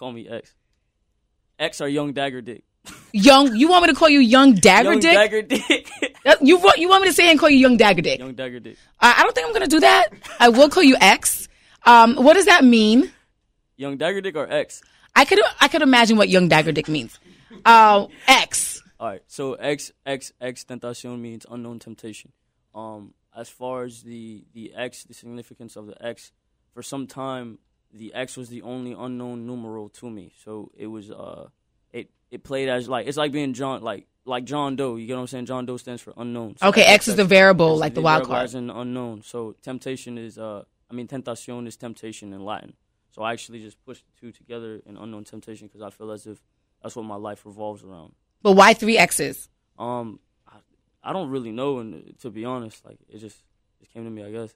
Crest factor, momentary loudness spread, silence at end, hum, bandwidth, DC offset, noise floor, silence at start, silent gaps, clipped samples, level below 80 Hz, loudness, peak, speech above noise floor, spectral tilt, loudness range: 20 dB; 25 LU; 0.1 s; none; 16 kHz; under 0.1%; -70 dBFS; 0 s; none; under 0.1%; -54 dBFS; -15 LUFS; 0 dBFS; 51 dB; -3.5 dB/octave; 23 LU